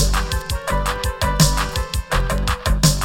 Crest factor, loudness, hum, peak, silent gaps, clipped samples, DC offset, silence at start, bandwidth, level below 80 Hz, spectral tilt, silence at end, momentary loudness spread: 18 dB; -20 LUFS; none; -2 dBFS; none; under 0.1%; under 0.1%; 0 s; 17 kHz; -22 dBFS; -4 dB/octave; 0 s; 7 LU